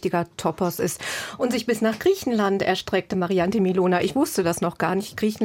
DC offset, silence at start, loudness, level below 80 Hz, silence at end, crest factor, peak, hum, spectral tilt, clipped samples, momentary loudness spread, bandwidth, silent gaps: under 0.1%; 0 s; -23 LUFS; -56 dBFS; 0 s; 14 dB; -8 dBFS; none; -5 dB/octave; under 0.1%; 5 LU; 17 kHz; none